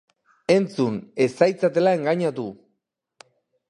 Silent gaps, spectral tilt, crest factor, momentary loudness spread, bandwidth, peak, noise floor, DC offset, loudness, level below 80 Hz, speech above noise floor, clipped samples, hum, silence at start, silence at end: none; -6.5 dB/octave; 20 dB; 12 LU; 11 kHz; -4 dBFS; -77 dBFS; under 0.1%; -22 LUFS; -68 dBFS; 56 dB; under 0.1%; none; 0.5 s; 1.15 s